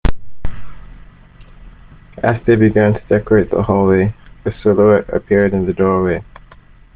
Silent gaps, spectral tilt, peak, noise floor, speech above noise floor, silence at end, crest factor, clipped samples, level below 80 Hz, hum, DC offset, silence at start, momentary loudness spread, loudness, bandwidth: none; -8 dB/octave; 0 dBFS; -42 dBFS; 29 dB; 0.75 s; 16 dB; under 0.1%; -30 dBFS; none; under 0.1%; 0.05 s; 14 LU; -14 LUFS; 4.6 kHz